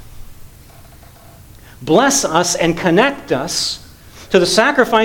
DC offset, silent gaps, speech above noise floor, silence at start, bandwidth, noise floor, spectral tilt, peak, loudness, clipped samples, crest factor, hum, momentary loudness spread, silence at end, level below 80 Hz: under 0.1%; none; 27 dB; 0.05 s; 19.5 kHz; -41 dBFS; -3 dB/octave; 0 dBFS; -14 LUFS; under 0.1%; 16 dB; none; 9 LU; 0 s; -42 dBFS